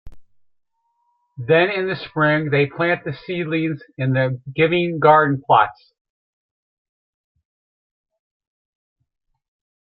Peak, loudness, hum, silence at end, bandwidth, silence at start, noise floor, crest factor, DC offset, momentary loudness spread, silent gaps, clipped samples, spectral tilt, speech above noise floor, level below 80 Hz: -2 dBFS; -18 LUFS; none; 4.15 s; 5.4 kHz; 0.05 s; -69 dBFS; 20 dB; under 0.1%; 10 LU; none; under 0.1%; -10.5 dB/octave; 51 dB; -56 dBFS